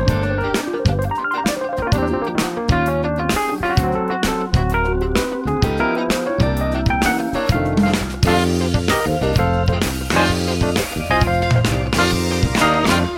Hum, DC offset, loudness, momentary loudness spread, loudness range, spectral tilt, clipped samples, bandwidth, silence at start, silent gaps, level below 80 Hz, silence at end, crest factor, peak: none; under 0.1%; -18 LUFS; 4 LU; 2 LU; -5.5 dB/octave; under 0.1%; 17 kHz; 0 s; none; -28 dBFS; 0 s; 16 dB; -2 dBFS